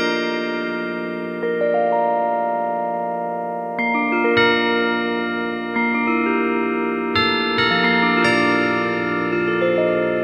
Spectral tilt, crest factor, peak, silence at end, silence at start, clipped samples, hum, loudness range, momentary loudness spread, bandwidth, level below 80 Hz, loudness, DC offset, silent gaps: -5.5 dB/octave; 16 dB; -2 dBFS; 0 s; 0 s; under 0.1%; none; 4 LU; 8 LU; 10.5 kHz; -58 dBFS; -19 LUFS; under 0.1%; none